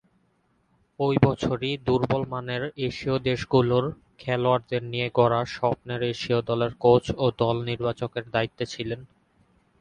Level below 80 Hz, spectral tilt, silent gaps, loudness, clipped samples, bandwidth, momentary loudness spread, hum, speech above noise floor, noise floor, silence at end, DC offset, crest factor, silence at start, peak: -52 dBFS; -7 dB/octave; none; -25 LUFS; under 0.1%; 9.4 kHz; 9 LU; none; 43 dB; -68 dBFS; 0.75 s; under 0.1%; 22 dB; 1 s; -2 dBFS